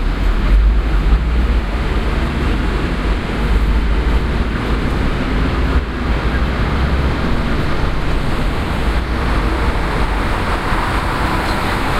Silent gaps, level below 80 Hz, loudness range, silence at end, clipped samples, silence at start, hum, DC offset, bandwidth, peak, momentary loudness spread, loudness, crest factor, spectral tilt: none; -16 dBFS; 1 LU; 0 s; under 0.1%; 0 s; none; under 0.1%; 12.5 kHz; -2 dBFS; 3 LU; -18 LUFS; 14 dB; -6.5 dB/octave